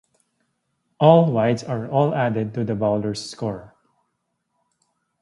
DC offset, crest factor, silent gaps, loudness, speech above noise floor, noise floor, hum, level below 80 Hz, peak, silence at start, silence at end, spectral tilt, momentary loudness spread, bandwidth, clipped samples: under 0.1%; 22 dB; none; -20 LUFS; 55 dB; -75 dBFS; none; -58 dBFS; 0 dBFS; 1 s; 1.55 s; -7.5 dB/octave; 14 LU; 11.5 kHz; under 0.1%